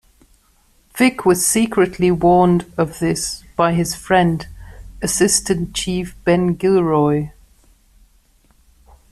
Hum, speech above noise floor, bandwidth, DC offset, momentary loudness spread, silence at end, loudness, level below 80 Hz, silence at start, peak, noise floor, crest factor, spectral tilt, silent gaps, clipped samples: none; 40 dB; 14 kHz; under 0.1%; 9 LU; 1.8 s; -17 LUFS; -42 dBFS; 0.95 s; -2 dBFS; -56 dBFS; 16 dB; -4.5 dB/octave; none; under 0.1%